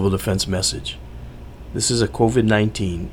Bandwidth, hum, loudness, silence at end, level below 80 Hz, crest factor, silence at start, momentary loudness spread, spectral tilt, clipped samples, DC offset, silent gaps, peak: 17.5 kHz; none; -20 LUFS; 0 s; -36 dBFS; 16 dB; 0 s; 21 LU; -4.5 dB/octave; under 0.1%; under 0.1%; none; -4 dBFS